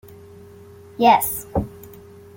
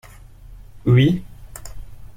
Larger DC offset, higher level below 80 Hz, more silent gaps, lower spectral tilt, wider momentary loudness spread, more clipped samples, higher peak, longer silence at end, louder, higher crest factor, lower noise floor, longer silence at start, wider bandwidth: neither; about the same, -44 dBFS vs -40 dBFS; neither; second, -4.5 dB/octave vs -7.5 dB/octave; about the same, 25 LU vs 24 LU; neither; about the same, -2 dBFS vs -4 dBFS; first, 0.5 s vs 0.1 s; about the same, -19 LUFS vs -18 LUFS; about the same, 20 dB vs 18 dB; about the same, -44 dBFS vs -41 dBFS; first, 1 s vs 0.5 s; about the same, 17 kHz vs 15.5 kHz